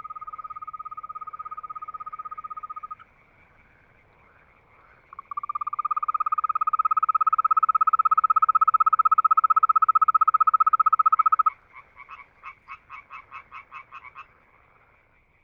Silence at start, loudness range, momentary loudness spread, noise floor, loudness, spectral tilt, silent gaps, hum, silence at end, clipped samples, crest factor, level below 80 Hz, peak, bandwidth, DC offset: 0.05 s; 21 LU; 23 LU; -61 dBFS; -20 LUFS; -4.5 dB/octave; none; none; 1.2 s; under 0.1%; 16 dB; -68 dBFS; -10 dBFS; 3.2 kHz; under 0.1%